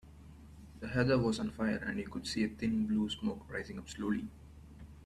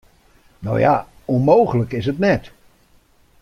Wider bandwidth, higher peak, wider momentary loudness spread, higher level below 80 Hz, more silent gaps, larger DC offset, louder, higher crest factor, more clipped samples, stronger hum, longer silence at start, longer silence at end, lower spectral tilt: about the same, 12 kHz vs 12 kHz; second, -16 dBFS vs -2 dBFS; first, 24 LU vs 9 LU; second, -56 dBFS vs -48 dBFS; neither; neither; second, -35 LUFS vs -18 LUFS; about the same, 20 dB vs 18 dB; neither; neither; second, 0.05 s vs 0.6 s; second, 0 s vs 0.95 s; second, -6 dB/octave vs -8.5 dB/octave